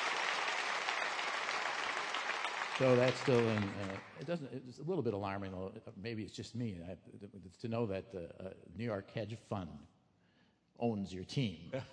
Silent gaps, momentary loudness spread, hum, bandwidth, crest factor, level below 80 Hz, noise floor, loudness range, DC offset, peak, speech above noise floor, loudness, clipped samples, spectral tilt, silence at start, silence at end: none; 16 LU; none; 10.5 kHz; 22 dB; -72 dBFS; -72 dBFS; 9 LU; under 0.1%; -16 dBFS; 34 dB; -38 LUFS; under 0.1%; -5 dB/octave; 0 s; 0 s